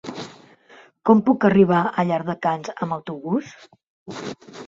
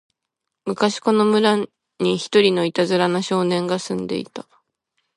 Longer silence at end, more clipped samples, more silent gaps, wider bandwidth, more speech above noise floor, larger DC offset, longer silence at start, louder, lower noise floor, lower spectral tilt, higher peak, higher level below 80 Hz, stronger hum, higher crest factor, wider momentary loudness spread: second, 0 s vs 0.75 s; neither; first, 3.88-4.06 s vs none; second, 7.6 kHz vs 11.5 kHz; second, 30 dB vs 62 dB; neither; second, 0.05 s vs 0.65 s; about the same, -20 LUFS vs -20 LUFS; second, -51 dBFS vs -81 dBFS; first, -7.5 dB/octave vs -5 dB/octave; about the same, -2 dBFS vs -2 dBFS; about the same, -62 dBFS vs -66 dBFS; neither; about the same, 20 dB vs 18 dB; first, 19 LU vs 13 LU